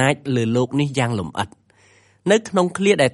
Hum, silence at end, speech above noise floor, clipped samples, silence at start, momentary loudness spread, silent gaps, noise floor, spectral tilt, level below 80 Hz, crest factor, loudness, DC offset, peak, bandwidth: none; 0.05 s; 36 dB; under 0.1%; 0 s; 10 LU; none; -55 dBFS; -5.5 dB/octave; -56 dBFS; 18 dB; -20 LUFS; under 0.1%; -2 dBFS; 11.5 kHz